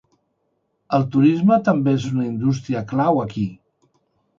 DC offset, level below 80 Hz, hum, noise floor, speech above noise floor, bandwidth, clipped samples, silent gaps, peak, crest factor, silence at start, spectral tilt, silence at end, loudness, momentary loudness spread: under 0.1%; -56 dBFS; none; -70 dBFS; 52 dB; 7.4 kHz; under 0.1%; none; -4 dBFS; 16 dB; 0.9 s; -8 dB/octave; 0.85 s; -19 LUFS; 9 LU